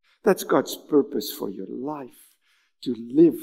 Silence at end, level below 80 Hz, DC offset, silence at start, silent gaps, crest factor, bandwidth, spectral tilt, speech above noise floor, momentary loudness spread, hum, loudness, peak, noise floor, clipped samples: 0 s; -76 dBFS; under 0.1%; 0.25 s; none; 20 dB; 16 kHz; -5.5 dB/octave; 43 dB; 15 LU; none; -24 LUFS; -4 dBFS; -66 dBFS; under 0.1%